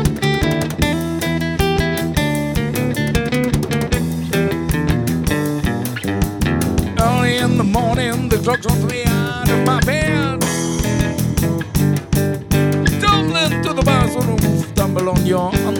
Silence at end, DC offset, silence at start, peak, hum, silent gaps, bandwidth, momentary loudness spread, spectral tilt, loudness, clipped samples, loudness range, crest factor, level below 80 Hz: 0 s; under 0.1%; 0 s; -2 dBFS; none; none; 19.5 kHz; 4 LU; -5.5 dB/octave; -17 LUFS; under 0.1%; 2 LU; 16 dB; -28 dBFS